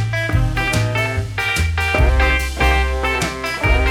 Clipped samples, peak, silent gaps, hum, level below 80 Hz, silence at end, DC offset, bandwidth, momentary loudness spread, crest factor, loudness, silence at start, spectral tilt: under 0.1%; -2 dBFS; none; none; -20 dBFS; 0 s; under 0.1%; 16 kHz; 4 LU; 14 dB; -18 LUFS; 0 s; -5 dB/octave